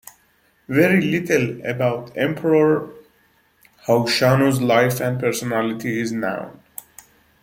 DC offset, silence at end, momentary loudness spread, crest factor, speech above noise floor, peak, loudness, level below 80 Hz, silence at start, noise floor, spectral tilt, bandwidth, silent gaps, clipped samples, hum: under 0.1%; 0.9 s; 15 LU; 18 dB; 41 dB; -2 dBFS; -19 LUFS; -60 dBFS; 0.7 s; -60 dBFS; -5.5 dB/octave; 16.5 kHz; none; under 0.1%; none